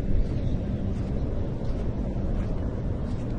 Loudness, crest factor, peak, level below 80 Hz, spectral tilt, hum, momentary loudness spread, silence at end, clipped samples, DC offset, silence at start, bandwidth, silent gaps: -30 LUFS; 14 dB; -12 dBFS; -30 dBFS; -9.5 dB/octave; none; 2 LU; 0 s; under 0.1%; under 0.1%; 0 s; 6.8 kHz; none